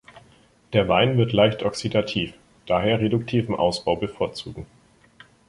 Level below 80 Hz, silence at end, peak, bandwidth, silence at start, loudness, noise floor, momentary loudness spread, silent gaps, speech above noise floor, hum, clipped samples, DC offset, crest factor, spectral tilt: -50 dBFS; 0.85 s; -4 dBFS; 11.5 kHz; 0.15 s; -22 LUFS; -56 dBFS; 10 LU; none; 34 dB; none; under 0.1%; under 0.1%; 20 dB; -6 dB/octave